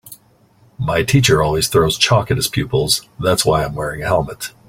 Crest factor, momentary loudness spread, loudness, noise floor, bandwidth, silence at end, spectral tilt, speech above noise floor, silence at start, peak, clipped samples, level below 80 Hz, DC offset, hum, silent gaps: 18 dB; 7 LU; -16 LUFS; -52 dBFS; 16.5 kHz; 0.2 s; -4 dB/octave; 36 dB; 0.05 s; 0 dBFS; under 0.1%; -38 dBFS; under 0.1%; none; none